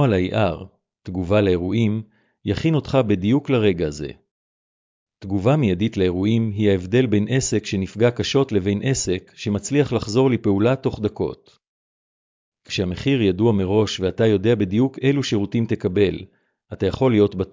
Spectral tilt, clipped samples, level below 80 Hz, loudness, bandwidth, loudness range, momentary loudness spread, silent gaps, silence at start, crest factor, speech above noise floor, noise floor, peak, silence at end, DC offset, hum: -6.5 dB/octave; under 0.1%; -42 dBFS; -20 LUFS; 7.6 kHz; 3 LU; 9 LU; 4.31-5.07 s, 11.68-12.52 s; 0 s; 16 dB; over 70 dB; under -90 dBFS; -6 dBFS; 0.05 s; under 0.1%; none